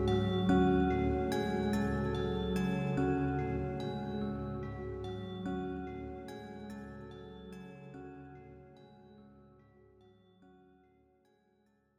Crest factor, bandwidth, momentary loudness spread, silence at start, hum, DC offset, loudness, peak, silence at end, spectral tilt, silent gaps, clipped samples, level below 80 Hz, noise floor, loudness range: 18 dB; 13.5 kHz; 19 LU; 0 s; none; under 0.1%; -35 LUFS; -18 dBFS; 2.6 s; -7.5 dB/octave; none; under 0.1%; -50 dBFS; -72 dBFS; 21 LU